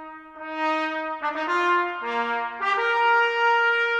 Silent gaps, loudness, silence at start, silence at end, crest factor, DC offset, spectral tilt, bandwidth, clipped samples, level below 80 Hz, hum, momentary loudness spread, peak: none; -23 LUFS; 0 s; 0 s; 14 dB; under 0.1%; -2 dB/octave; 9.2 kHz; under 0.1%; -66 dBFS; none; 8 LU; -10 dBFS